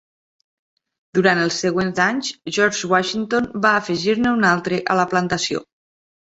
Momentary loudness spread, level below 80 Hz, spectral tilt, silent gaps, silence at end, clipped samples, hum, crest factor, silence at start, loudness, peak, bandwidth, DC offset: 6 LU; -56 dBFS; -4 dB/octave; none; 0.65 s; under 0.1%; none; 18 dB; 1.15 s; -19 LUFS; -2 dBFS; 8.2 kHz; under 0.1%